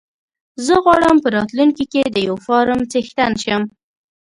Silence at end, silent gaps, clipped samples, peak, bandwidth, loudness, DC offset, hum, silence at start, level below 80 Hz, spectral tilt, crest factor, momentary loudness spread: 0.55 s; none; under 0.1%; 0 dBFS; 11.5 kHz; -16 LUFS; under 0.1%; none; 0.6 s; -48 dBFS; -4.5 dB/octave; 16 dB; 8 LU